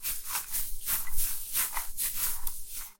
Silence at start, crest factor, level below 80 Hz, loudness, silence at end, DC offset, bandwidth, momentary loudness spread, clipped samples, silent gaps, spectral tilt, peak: 0 s; 16 dB; -40 dBFS; -31 LUFS; 0.1 s; under 0.1%; 17 kHz; 6 LU; under 0.1%; none; 0.5 dB/octave; -14 dBFS